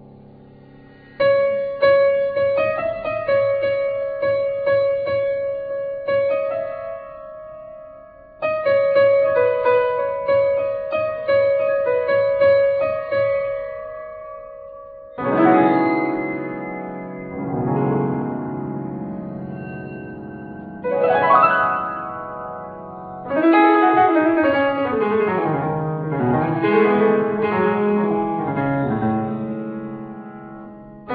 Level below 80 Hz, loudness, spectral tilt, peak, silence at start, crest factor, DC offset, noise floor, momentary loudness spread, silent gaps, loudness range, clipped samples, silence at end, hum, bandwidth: -54 dBFS; -19 LUFS; -10.5 dB/octave; -2 dBFS; 0 s; 18 dB; under 0.1%; -45 dBFS; 19 LU; none; 7 LU; under 0.1%; 0 s; none; 4.9 kHz